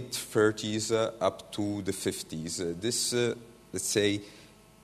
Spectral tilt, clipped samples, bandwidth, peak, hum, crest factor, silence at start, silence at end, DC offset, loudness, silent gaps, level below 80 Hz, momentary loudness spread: -3.5 dB/octave; under 0.1%; 13.5 kHz; -12 dBFS; none; 20 dB; 0 s; 0.35 s; under 0.1%; -30 LUFS; none; -64 dBFS; 9 LU